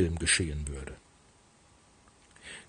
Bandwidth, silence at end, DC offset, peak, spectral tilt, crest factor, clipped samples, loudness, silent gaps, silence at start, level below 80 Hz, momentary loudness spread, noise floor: 10 kHz; 0.05 s; under 0.1%; -12 dBFS; -3 dB/octave; 22 dB; under 0.1%; -29 LUFS; none; 0 s; -46 dBFS; 24 LU; -61 dBFS